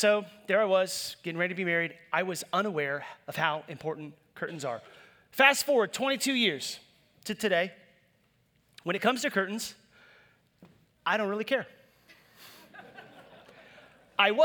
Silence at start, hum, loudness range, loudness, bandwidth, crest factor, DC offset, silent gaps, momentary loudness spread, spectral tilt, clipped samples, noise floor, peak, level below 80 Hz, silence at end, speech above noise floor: 0 s; none; 8 LU; -29 LUFS; over 20 kHz; 24 dB; under 0.1%; none; 16 LU; -3 dB/octave; under 0.1%; -69 dBFS; -6 dBFS; -78 dBFS; 0 s; 40 dB